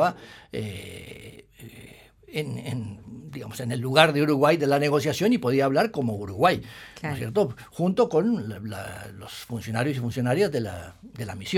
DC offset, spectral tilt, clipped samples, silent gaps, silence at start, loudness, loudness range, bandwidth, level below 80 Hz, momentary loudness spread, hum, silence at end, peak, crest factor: under 0.1%; -6 dB/octave; under 0.1%; none; 0 s; -25 LUFS; 12 LU; 17.5 kHz; -58 dBFS; 19 LU; none; 0 s; 0 dBFS; 26 dB